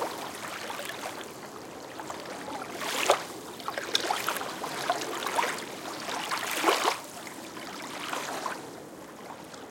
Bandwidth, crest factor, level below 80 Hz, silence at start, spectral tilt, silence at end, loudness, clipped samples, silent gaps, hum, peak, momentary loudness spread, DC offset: 17 kHz; 30 dB; -74 dBFS; 0 s; -1.5 dB/octave; 0 s; -32 LUFS; under 0.1%; none; none; -4 dBFS; 15 LU; under 0.1%